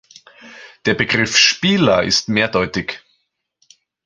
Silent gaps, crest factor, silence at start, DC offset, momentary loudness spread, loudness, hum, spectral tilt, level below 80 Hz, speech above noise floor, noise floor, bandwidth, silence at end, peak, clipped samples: none; 18 dB; 0.45 s; under 0.1%; 12 LU; -15 LUFS; none; -3 dB/octave; -48 dBFS; 52 dB; -68 dBFS; 10.5 kHz; 1.1 s; 0 dBFS; under 0.1%